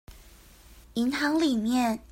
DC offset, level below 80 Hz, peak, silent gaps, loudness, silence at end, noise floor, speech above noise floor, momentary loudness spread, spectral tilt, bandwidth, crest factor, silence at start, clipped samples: under 0.1%; -54 dBFS; -14 dBFS; none; -27 LUFS; 0.05 s; -52 dBFS; 27 dB; 5 LU; -4 dB/octave; 16.5 kHz; 14 dB; 0.1 s; under 0.1%